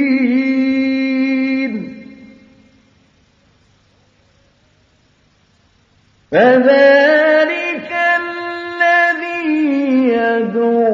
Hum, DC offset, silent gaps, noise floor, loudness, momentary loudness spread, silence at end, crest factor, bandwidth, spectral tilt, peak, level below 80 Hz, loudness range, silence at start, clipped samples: none; under 0.1%; none; -55 dBFS; -14 LUFS; 12 LU; 0 s; 16 dB; 7.2 kHz; -6 dB/octave; 0 dBFS; -62 dBFS; 11 LU; 0 s; under 0.1%